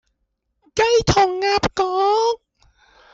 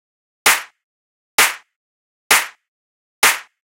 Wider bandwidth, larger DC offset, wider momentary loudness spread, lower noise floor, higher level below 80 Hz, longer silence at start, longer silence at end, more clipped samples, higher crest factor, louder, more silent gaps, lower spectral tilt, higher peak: second, 8 kHz vs 16 kHz; neither; second, 7 LU vs 10 LU; second, -73 dBFS vs under -90 dBFS; first, -40 dBFS vs -58 dBFS; first, 0.75 s vs 0.45 s; first, 0.8 s vs 0.3 s; neither; second, 14 dB vs 20 dB; about the same, -18 LUFS vs -16 LUFS; second, none vs 0.84-1.38 s, 1.76-2.30 s, 2.68-3.22 s; first, -4 dB/octave vs 2 dB/octave; second, -6 dBFS vs 0 dBFS